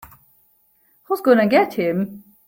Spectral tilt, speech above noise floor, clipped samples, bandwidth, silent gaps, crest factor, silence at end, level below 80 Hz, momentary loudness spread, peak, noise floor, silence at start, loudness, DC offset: -7 dB/octave; 43 dB; under 0.1%; 17 kHz; none; 18 dB; 0.3 s; -62 dBFS; 12 LU; -2 dBFS; -60 dBFS; 1.1 s; -18 LUFS; under 0.1%